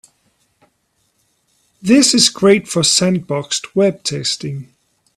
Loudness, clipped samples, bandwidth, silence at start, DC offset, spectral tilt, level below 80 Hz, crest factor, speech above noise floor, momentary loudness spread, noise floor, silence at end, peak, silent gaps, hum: -14 LUFS; under 0.1%; 13.5 kHz; 1.85 s; under 0.1%; -3.5 dB/octave; -56 dBFS; 18 dB; 50 dB; 12 LU; -64 dBFS; 0.55 s; 0 dBFS; none; none